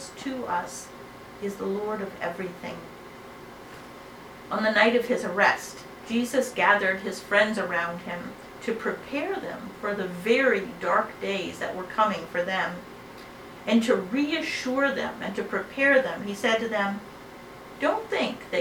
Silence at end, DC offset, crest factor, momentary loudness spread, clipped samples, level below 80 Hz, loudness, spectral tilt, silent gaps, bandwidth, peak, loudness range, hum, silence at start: 0 s; under 0.1%; 22 dB; 22 LU; under 0.1%; -62 dBFS; -26 LUFS; -4 dB/octave; none; over 20 kHz; -6 dBFS; 9 LU; none; 0 s